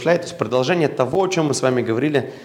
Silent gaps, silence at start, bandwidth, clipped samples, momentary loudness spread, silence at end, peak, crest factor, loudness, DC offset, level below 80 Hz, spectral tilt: none; 0 s; 15.5 kHz; under 0.1%; 2 LU; 0 s; -2 dBFS; 18 dB; -19 LUFS; under 0.1%; -62 dBFS; -5.5 dB/octave